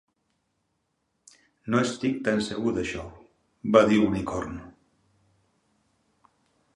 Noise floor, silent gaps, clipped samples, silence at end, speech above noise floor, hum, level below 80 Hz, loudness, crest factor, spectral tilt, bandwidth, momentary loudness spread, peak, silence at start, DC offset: -76 dBFS; none; under 0.1%; 2.05 s; 51 dB; none; -54 dBFS; -25 LUFS; 26 dB; -6 dB/octave; 11 kHz; 18 LU; -4 dBFS; 1.65 s; under 0.1%